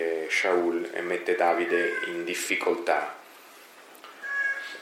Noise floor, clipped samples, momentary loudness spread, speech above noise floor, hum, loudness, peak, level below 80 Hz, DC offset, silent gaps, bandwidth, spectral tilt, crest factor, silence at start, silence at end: -50 dBFS; under 0.1%; 13 LU; 24 dB; none; -27 LUFS; -10 dBFS; under -90 dBFS; under 0.1%; none; 16 kHz; -2.5 dB/octave; 18 dB; 0 s; 0 s